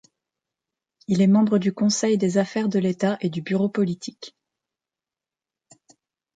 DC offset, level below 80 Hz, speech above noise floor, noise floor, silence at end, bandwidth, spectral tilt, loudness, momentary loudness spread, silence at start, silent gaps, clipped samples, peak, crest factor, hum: under 0.1%; -66 dBFS; over 69 dB; under -90 dBFS; 2.1 s; 9.2 kHz; -6 dB/octave; -22 LUFS; 17 LU; 1.1 s; none; under 0.1%; -8 dBFS; 16 dB; none